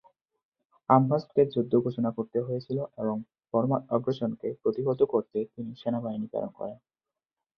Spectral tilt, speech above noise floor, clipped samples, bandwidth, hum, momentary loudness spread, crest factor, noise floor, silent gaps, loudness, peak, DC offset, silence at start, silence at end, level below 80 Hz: -10.5 dB/octave; 62 dB; under 0.1%; 6 kHz; none; 11 LU; 24 dB; -89 dBFS; none; -29 LUFS; -6 dBFS; under 0.1%; 0.9 s; 0.8 s; -70 dBFS